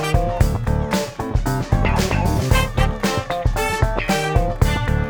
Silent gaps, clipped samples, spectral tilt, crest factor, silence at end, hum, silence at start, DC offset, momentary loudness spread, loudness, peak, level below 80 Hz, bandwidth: none; under 0.1%; -5.5 dB/octave; 16 dB; 0 s; none; 0 s; under 0.1%; 4 LU; -20 LUFS; -2 dBFS; -24 dBFS; over 20 kHz